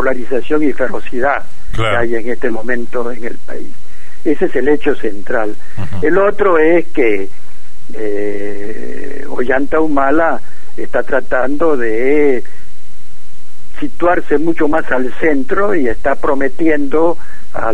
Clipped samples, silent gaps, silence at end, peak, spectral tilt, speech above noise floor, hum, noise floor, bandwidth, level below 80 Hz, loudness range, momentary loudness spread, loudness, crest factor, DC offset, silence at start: under 0.1%; none; 0 s; 0 dBFS; -7 dB/octave; 29 dB; none; -44 dBFS; 11.5 kHz; -36 dBFS; 4 LU; 15 LU; -16 LUFS; 16 dB; 40%; 0 s